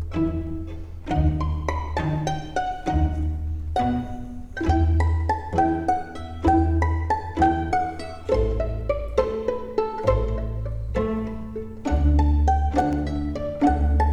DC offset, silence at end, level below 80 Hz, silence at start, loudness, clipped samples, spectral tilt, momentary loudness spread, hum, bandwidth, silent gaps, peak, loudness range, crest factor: under 0.1%; 0 s; -28 dBFS; 0 s; -24 LUFS; under 0.1%; -8 dB/octave; 10 LU; none; 8.2 kHz; none; -6 dBFS; 3 LU; 16 dB